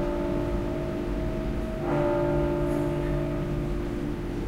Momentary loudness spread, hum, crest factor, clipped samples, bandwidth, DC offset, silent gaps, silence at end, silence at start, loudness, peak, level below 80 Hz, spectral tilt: 6 LU; none; 14 dB; under 0.1%; 15.5 kHz; under 0.1%; none; 0 s; 0 s; -29 LUFS; -14 dBFS; -34 dBFS; -8 dB/octave